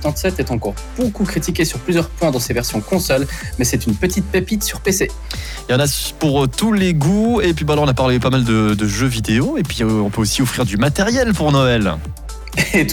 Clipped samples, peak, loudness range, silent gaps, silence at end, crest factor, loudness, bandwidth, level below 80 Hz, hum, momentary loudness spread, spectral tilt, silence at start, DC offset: under 0.1%; -4 dBFS; 3 LU; none; 0 s; 12 dB; -17 LUFS; 19.5 kHz; -30 dBFS; none; 7 LU; -5 dB/octave; 0 s; under 0.1%